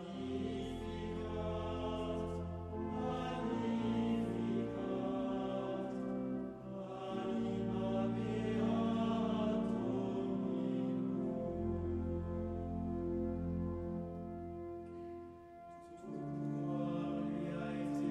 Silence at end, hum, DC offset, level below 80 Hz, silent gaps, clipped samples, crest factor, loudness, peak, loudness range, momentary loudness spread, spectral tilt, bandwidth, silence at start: 0 s; none; under 0.1%; -56 dBFS; none; under 0.1%; 14 dB; -39 LUFS; -24 dBFS; 6 LU; 10 LU; -8 dB/octave; 9.6 kHz; 0 s